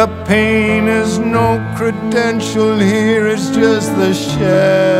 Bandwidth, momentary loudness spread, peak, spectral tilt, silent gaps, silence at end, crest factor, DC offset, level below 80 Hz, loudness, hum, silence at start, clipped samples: 15.5 kHz; 4 LU; 0 dBFS; -5.5 dB/octave; none; 0 s; 12 dB; under 0.1%; -40 dBFS; -13 LUFS; none; 0 s; under 0.1%